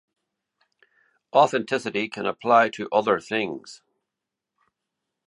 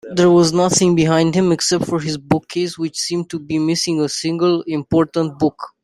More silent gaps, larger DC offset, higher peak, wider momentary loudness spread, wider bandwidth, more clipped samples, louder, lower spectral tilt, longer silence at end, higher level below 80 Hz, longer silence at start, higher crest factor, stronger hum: neither; neither; about the same, -4 dBFS vs -2 dBFS; about the same, 9 LU vs 8 LU; second, 11 kHz vs 12.5 kHz; neither; second, -23 LUFS vs -17 LUFS; about the same, -4.5 dB/octave vs -5 dB/octave; first, 1.5 s vs 0.15 s; second, -72 dBFS vs -52 dBFS; first, 1.35 s vs 0.05 s; first, 22 dB vs 16 dB; neither